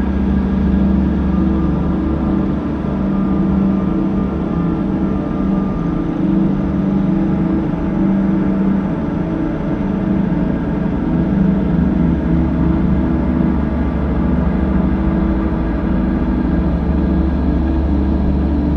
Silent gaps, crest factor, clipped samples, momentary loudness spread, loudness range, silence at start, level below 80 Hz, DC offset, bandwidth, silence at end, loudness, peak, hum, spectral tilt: none; 14 dB; under 0.1%; 3 LU; 1 LU; 0 s; -22 dBFS; under 0.1%; 5.2 kHz; 0 s; -16 LUFS; -2 dBFS; none; -10.5 dB/octave